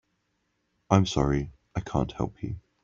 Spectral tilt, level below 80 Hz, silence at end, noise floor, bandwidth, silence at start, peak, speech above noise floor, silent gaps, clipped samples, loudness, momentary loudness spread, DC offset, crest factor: -6.5 dB/octave; -44 dBFS; 0.25 s; -75 dBFS; 7.6 kHz; 0.9 s; -4 dBFS; 49 dB; none; under 0.1%; -28 LUFS; 13 LU; under 0.1%; 24 dB